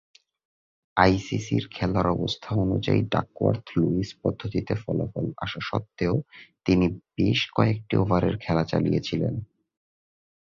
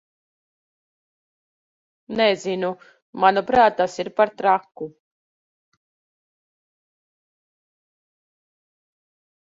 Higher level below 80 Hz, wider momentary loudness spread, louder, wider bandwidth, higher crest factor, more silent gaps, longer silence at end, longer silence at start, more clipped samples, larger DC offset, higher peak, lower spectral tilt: first, -46 dBFS vs -62 dBFS; second, 8 LU vs 19 LU; second, -26 LUFS vs -20 LUFS; about the same, 7.4 kHz vs 7.8 kHz; about the same, 24 dB vs 24 dB; second, none vs 3.02-3.13 s; second, 1 s vs 4.55 s; second, 0.95 s vs 2.1 s; neither; neither; about the same, -2 dBFS vs 0 dBFS; first, -7 dB/octave vs -4.5 dB/octave